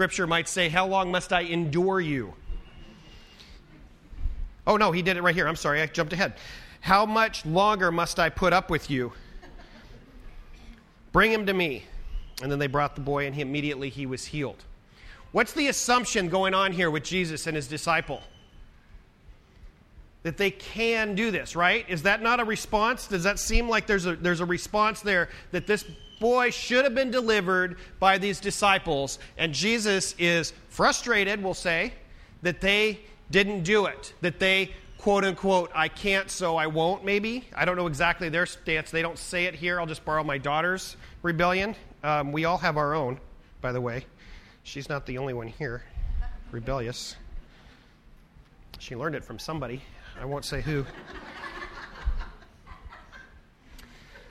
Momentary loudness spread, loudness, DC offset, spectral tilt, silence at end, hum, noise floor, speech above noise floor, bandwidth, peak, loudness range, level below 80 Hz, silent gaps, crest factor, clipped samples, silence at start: 15 LU; -26 LUFS; under 0.1%; -4 dB/octave; 0 s; none; -54 dBFS; 28 dB; 15.5 kHz; -6 dBFS; 11 LU; -42 dBFS; none; 22 dB; under 0.1%; 0 s